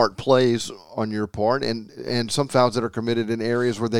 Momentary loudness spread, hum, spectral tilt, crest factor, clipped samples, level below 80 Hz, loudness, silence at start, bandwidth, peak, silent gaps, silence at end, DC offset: 9 LU; none; -5.5 dB/octave; 18 dB; under 0.1%; -54 dBFS; -23 LUFS; 0 s; 16 kHz; -4 dBFS; none; 0 s; 0.5%